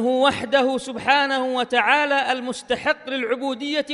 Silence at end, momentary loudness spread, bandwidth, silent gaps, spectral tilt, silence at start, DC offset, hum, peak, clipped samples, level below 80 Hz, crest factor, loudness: 0 s; 7 LU; 11.5 kHz; none; -3 dB/octave; 0 s; under 0.1%; none; -2 dBFS; under 0.1%; -62 dBFS; 18 dB; -21 LUFS